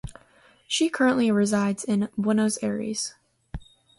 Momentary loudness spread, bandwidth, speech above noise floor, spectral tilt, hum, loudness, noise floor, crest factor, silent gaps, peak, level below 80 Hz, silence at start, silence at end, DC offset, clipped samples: 21 LU; 11.5 kHz; 34 dB; -4.5 dB/octave; none; -24 LUFS; -58 dBFS; 16 dB; none; -10 dBFS; -50 dBFS; 0.05 s; 0.4 s; under 0.1%; under 0.1%